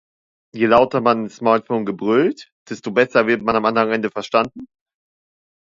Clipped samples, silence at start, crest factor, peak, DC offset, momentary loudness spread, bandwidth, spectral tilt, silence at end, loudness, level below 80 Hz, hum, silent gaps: under 0.1%; 0.55 s; 18 dB; 0 dBFS; under 0.1%; 11 LU; 7.6 kHz; -6 dB/octave; 0.95 s; -18 LUFS; -56 dBFS; none; 2.52-2.66 s